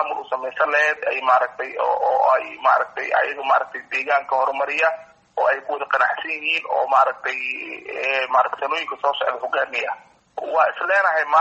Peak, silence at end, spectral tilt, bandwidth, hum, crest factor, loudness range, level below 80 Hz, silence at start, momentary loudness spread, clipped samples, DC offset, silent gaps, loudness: -4 dBFS; 0 s; -1.5 dB/octave; 8.2 kHz; none; 16 dB; 2 LU; -72 dBFS; 0 s; 8 LU; under 0.1%; under 0.1%; none; -20 LUFS